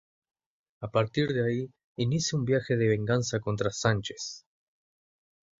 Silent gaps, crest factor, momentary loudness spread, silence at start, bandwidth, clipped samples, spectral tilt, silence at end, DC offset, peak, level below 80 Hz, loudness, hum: 1.84-1.95 s; 22 dB; 12 LU; 0.8 s; 7.8 kHz; under 0.1%; -5.5 dB/octave; 1.2 s; under 0.1%; -8 dBFS; -58 dBFS; -29 LUFS; none